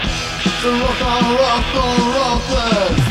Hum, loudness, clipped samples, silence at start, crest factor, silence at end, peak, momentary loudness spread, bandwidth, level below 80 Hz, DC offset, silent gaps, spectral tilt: none; -16 LUFS; under 0.1%; 0 s; 14 dB; 0 s; -2 dBFS; 3 LU; 16 kHz; -26 dBFS; under 0.1%; none; -4.5 dB/octave